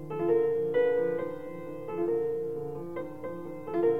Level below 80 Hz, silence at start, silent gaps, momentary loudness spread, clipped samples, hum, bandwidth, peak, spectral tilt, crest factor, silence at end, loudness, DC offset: -66 dBFS; 0 s; none; 13 LU; under 0.1%; none; 3.9 kHz; -16 dBFS; -8.5 dB/octave; 14 dB; 0 s; -31 LUFS; 0.4%